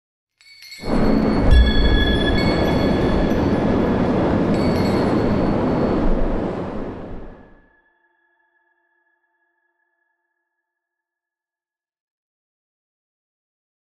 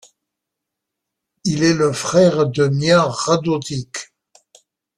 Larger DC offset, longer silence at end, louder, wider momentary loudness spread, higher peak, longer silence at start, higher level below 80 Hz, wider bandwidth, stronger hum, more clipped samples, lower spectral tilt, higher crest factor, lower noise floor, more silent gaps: neither; first, 6.65 s vs 0.95 s; about the same, -19 LUFS vs -17 LUFS; about the same, 13 LU vs 12 LU; about the same, -4 dBFS vs -2 dBFS; second, 0.6 s vs 1.45 s; first, -26 dBFS vs -54 dBFS; about the same, 12 kHz vs 12.5 kHz; neither; neither; first, -7.5 dB/octave vs -5 dB/octave; about the same, 18 dB vs 18 dB; first, under -90 dBFS vs -81 dBFS; neither